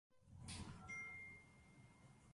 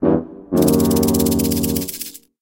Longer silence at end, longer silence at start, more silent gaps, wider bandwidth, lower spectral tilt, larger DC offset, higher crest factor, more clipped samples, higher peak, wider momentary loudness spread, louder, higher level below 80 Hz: second, 0 s vs 0.25 s; about the same, 0.1 s vs 0 s; neither; second, 11.5 kHz vs 17.5 kHz; second, -3.5 dB/octave vs -5.5 dB/octave; neither; about the same, 18 dB vs 16 dB; neither; second, -40 dBFS vs -2 dBFS; first, 16 LU vs 11 LU; second, -54 LUFS vs -18 LUFS; second, -68 dBFS vs -36 dBFS